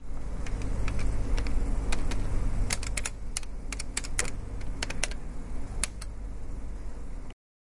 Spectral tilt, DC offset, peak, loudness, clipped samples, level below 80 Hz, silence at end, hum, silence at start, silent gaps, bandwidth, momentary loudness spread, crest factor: -3.5 dB/octave; under 0.1%; -6 dBFS; -35 LUFS; under 0.1%; -32 dBFS; 0.45 s; none; 0 s; none; 11.5 kHz; 10 LU; 24 dB